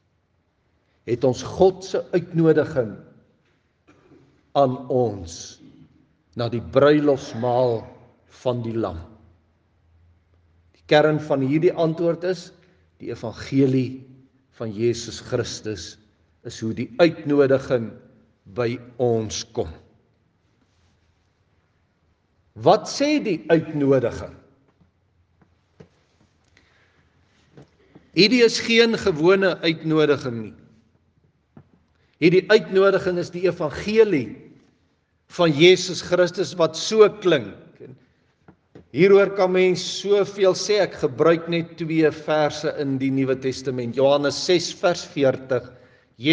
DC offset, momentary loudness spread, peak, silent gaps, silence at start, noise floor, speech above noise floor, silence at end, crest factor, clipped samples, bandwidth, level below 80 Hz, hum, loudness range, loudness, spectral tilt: under 0.1%; 15 LU; 0 dBFS; none; 1.05 s; -67 dBFS; 47 dB; 0 s; 22 dB; under 0.1%; 9.6 kHz; -60 dBFS; none; 8 LU; -21 LUFS; -5.5 dB/octave